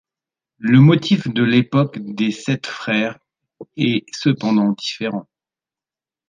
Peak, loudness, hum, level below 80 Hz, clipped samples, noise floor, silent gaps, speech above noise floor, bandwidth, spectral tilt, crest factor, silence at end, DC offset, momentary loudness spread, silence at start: -2 dBFS; -18 LUFS; none; -62 dBFS; under 0.1%; under -90 dBFS; none; over 73 dB; 9.4 kHz; -6.5 dB/octave; 16 dB; 1.05 s; under 0.1%; 13 LU; 0.6 s